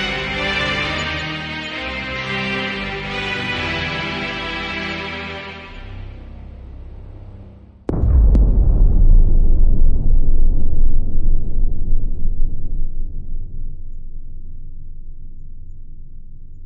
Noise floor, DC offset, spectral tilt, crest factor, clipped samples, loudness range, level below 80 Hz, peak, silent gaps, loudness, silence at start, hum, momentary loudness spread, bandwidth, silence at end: -40 dBFS; under 0.1%; -6 dB/octave; 12 dB; under 0.1%; 14 LU; -16 dBFS; -4 dBFS; none; -21 LUFS; 0 s; none; 22 LU; 6.6 kHz; 0 s